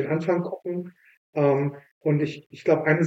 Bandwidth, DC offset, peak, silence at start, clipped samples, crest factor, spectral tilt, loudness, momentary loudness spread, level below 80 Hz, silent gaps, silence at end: 7.8 kHz; under 0.1%; -6 dBFS; 0 s; under 0.1%; 18 dB; -8.5 dB/octave; -26 LUFS; 11 LU; -74 dBFS; 1.17-1.33 s, 1.91-2.01 s, 2.46-2.50 s; 0 s